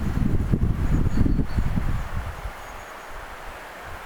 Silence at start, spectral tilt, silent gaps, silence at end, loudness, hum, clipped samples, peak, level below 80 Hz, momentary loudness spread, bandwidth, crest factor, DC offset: 0 s; -7.5 dB/octave; none; 0 s; -26 LUFS; none; under 0.1%; -8 dBFS; -28 dBFS; 14 LU; 17.5 kHz; 16 dB; under 0.1%